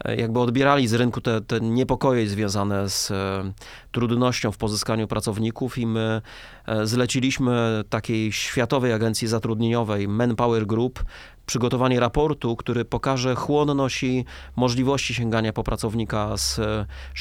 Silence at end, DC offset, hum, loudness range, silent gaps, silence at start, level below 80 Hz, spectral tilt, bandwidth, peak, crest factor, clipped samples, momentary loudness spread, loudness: 0 s; under 0.1%; none; 2 LU; none; 0 s; -42 dBFS; -5.5 dB/octave; 16.5 kHz; -4 dBFS; 18 dB; under 0.1%; 7 LU; -23 LUFS